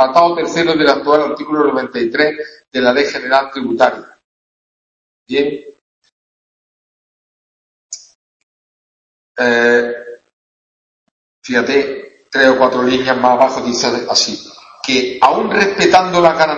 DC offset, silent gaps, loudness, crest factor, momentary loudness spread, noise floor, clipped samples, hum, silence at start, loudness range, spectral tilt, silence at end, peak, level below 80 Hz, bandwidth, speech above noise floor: under 0.1%; 4.24-5.26 s, 5.81-6.02 s, 6.12-7.89 s, 8.15-9.35 s, 10.33-11.42 s; -13 LUFS; 16 dB; 17 LU; under -90 dBFS; under 0.1%; none; 0 s; 13 LU; -3.5 dB/octave; 0 s; 0 dBFS; -54 dBFS; 8.4 kHz; over 77 dB